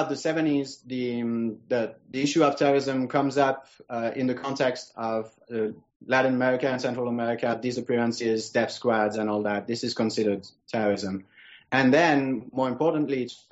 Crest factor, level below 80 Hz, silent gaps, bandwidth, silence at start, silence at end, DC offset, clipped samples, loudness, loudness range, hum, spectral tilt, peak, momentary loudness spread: 16 dB; -70 dBFS; 5.96-6.00 s; 8 kHz; 0 s; 0.15 s; under 0.1%; under 0.1%; -26 LUFS; 2 LU; none; -4 dB/octave; -8 dBFS; 10 LU